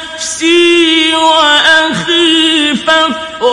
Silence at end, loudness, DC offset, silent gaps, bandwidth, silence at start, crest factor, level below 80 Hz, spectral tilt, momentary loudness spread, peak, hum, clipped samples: 0 s; -8 LUFS; under 0.1%; none; 11.5 kHz; 0 s; 10 dB; -48 dBFS; -2 dB/octave; 7 LU; 0 dBFS; none; 0.2%